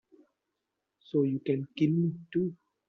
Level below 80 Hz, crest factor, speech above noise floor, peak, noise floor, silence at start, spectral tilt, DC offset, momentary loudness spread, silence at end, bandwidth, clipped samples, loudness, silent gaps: -74 dBFS; 18 dB; 56 dB; -14 dBFS; -85 dBFS; 1.15 s; -9 dB/octave; under 0.1%; 5 LU; 0.35 s; 6.2 kHz; under 0.1%; -31 LUFS; none